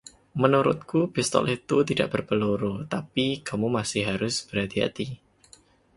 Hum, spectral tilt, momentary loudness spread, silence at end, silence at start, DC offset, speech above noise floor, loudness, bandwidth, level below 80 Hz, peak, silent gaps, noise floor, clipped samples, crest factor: none; -5 dB/octave; 7 LU; 0.8 s; 0.35 s; under 0.1%; 31 dB; -26 LUFS; 11.5 kHz; -56 dBFS; -4 dBFS; none; -57 dBFS; under 0.1%; 22 dB